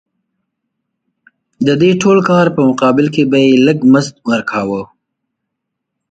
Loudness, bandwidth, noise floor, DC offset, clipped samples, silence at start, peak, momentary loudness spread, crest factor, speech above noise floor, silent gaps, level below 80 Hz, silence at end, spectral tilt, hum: -11 LUFS; 9 kHz; -75 dBFS; under 0.1%; under 0.1%; 1.6 s; 0 dBFS; 8 LU; 14 dB; 65 dB; none; -54 dBFS; 1.25 s; -6.5 dB/octave; none